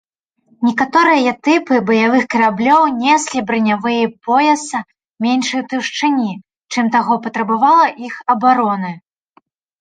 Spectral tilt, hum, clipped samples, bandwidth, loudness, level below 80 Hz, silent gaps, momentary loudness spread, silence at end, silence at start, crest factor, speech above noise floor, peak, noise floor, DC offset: -4 dB/octave; none; under 0.1%; 9.4 kHz; -15 LUFS; -62 dBFS; 5.09-5.14 s; 10 LU; 0.8 s; 0.6 s; 14 dB; 43 dB; -2 dBFS; -57 dBFS; under 0.1%